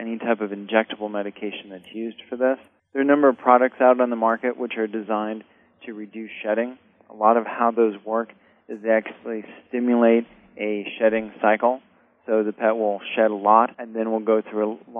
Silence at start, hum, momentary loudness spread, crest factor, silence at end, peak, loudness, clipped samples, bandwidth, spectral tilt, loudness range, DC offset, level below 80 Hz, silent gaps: 0 s; none; 15 LU; 22 dB; 0 s; 0 dBFS; -22 LUFS; under 0.1%; 3.7 kHz; -8.5 dB/octave; 4 LU; under 0.1%; -72 dBFS; none